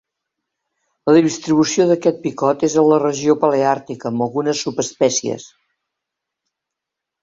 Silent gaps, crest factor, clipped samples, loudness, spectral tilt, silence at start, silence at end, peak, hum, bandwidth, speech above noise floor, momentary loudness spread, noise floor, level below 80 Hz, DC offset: none; 16 dB; under 0.1%; -17 LUFS; -5 dB/octave; 1.05 s; 1.75 s; -2 dBFS; none; 7.8 kHz; 67 dB; 9 LU; -83 dBFS; -62 dBFS; under 0.1%